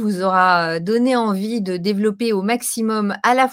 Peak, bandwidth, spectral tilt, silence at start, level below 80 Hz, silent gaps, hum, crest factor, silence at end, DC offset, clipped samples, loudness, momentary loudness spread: 0 dBFS; 16.5 kHz; -4.5 dB/octave; 0 s; -68 dBFS; none; none; 16 dB; 0 s; under 0.1%; under 0.1%; -18 LUFS; 6 LU